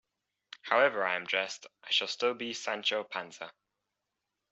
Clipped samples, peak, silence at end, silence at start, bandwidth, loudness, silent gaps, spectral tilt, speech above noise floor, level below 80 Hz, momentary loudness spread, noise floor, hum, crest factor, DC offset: under 0.1%; -10 dBFS; 1 s; 0.65 s; 8.2 kHz; -31 LUFS; none; -1.5 dB/octave; 54 dB; -84 dBFS; 17 LU; -86 dBFS; none; 24 dB; under 0.1%